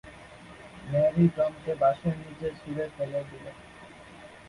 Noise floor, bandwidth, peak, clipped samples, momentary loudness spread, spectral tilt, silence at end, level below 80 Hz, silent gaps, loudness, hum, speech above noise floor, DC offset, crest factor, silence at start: -48 dBFS; 11 kHz; -12 dBFS; under 0.1%; 24 LU; -8.5 dB/octave; 0 s; -58 dBFS; none; -28 LUFS; none; 21 dB; under 0.1%; 18 dB; 0.05 s